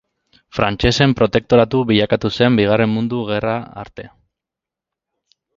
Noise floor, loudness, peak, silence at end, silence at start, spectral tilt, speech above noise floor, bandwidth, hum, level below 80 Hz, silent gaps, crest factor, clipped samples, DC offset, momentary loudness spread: -86 dBFS; -16 LUFS; 0 dBFS; 1.5 s; 0.55 s; -6.5 dB/octave; 70 dB; 7.6 kHz; none; -40 dBFS; none; 18 dB; under 0.1%; under 0.1%; 15 LU